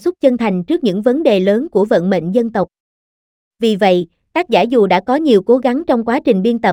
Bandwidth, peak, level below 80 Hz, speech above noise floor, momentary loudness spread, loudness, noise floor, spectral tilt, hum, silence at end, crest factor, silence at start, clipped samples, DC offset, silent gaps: 14.5 kHz; 0 dBFS; -54 dBFS; over 77 dB; 6 LU; -14 LUFS; under -90 dBFS; -7 dB/octave; none; 0 s; 14 dB; 0.05 s; under 0.1%; under 0.1%; 2.80-3.51 s